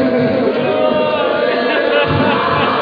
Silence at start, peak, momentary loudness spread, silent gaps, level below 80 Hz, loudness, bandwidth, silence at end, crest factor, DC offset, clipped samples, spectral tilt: 0 s; -2 dBFS; 2 LU; none; -46 dBFS; -14 LUFS; 5.2 kHz; 0 s; 12 dB; under 0.1%; under 0.1%; -8 dB/octave